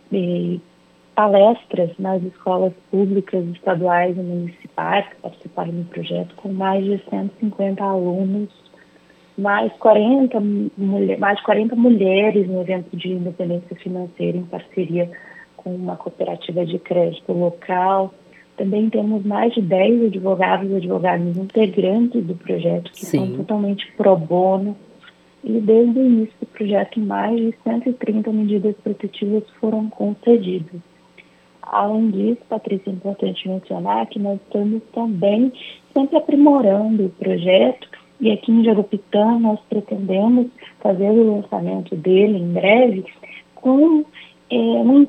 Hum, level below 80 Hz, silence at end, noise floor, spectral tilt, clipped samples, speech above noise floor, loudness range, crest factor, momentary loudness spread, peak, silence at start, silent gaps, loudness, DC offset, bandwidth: none; -72 dBFS; 0 s; -51 dBFS; -8 dB/octave; under 0.1%; 33 dB; 6 LU; 18 dB; 12 LU; 0 dBFS; 0.1 s; none; -19 LUFS; under 0.1%; 8.4 kHz